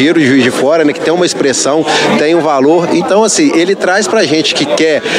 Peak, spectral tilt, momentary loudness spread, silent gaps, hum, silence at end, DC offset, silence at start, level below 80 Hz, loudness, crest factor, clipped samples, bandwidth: 0 dBFS; -3.5 dB/octave; 3 LU; none; none; 0 s; under 0.1%; 0 s; -56 dBFS; -9 LUFS; 10 dB; under 0.1%; 13.5 kHz